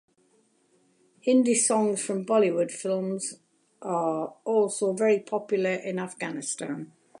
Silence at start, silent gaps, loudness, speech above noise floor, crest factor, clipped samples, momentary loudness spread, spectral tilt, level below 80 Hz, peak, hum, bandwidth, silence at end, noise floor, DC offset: 1.25 s; none; -26 LUFS; 40 dB; 16 dB; under 0.1%; 11 LU; -4.5 dB/octave; -82 dBFS; -12 dBFS; none; 11.5 kHz; 0.35 s; -66 dBFS; under 0.1%